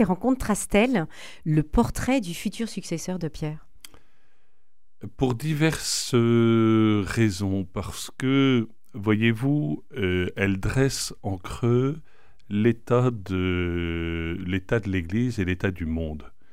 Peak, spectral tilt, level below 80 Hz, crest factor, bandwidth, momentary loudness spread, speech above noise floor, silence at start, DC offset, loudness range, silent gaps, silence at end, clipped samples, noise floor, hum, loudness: -6 dBFS; -6 dB/octave; -42 dBFS; 18 dB; 16 kHz; 11 LU; 50 dB; 0 s; 0.9%; 6 LU; none; 0.25 s; under 0.1%; -74 dBFS; none; -25 LUFS